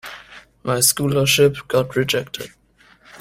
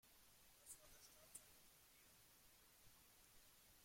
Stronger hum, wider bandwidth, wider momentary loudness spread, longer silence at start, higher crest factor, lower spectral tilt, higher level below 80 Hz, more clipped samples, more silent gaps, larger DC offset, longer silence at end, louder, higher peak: neither; about the same, 16 kHz vs 16.5 kHz; first, 20 LU vs 7 LU; about the same, 0.05 s vs 0 s; second, 20 dB vs 26 dB; first, -3.5 dB/octave vs -1 dB/octave; first, -52 dBFS vs -82 dBFS; neither; neither; neither; about the same, 0.05 s vs 0 s; first, -17 LUFS vs -66 LUFS; first, -2 dBFS vs -42 dBFS